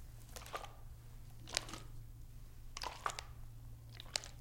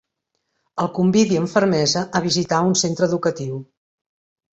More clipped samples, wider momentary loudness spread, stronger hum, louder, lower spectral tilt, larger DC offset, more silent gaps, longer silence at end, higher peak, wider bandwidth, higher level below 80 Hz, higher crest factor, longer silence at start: neither; first, 15 LU vs 11 LU; neither; second, -47 LUFS vs -19 LUFS; second, -2 dB/octave vs -4.5 dB/octave; neither; neither; second, 0 s vs 0.9 s; second, -8 dBFS vs -2 dBFS; first, 16.5 kHz vs 8 kHz; about the same, -54 dBFS vs -58 dBFS; first, 40 dB vs 18 dB; second, 0 s vs 0.75 s